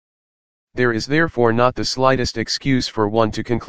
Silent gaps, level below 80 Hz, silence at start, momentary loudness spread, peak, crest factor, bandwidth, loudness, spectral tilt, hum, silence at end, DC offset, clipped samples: none; -42 dBFS; 0.65 s; 5 LU; 0 dBFS; 18 dB; 9.8 kHz; -18 LUFS; -5 dB/octave; none; 0 s; 2%; under 0.1%